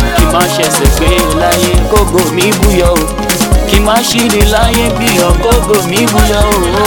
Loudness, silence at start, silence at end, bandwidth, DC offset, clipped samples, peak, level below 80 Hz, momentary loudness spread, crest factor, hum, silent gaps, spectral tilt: -9 LUFS; 0 s; 0 s; 18 kHz; under 0.1%; 0.4%; 0 dBFS; -14 dBFS; 2 LU; 8 dB; none; none; -4 dB/octave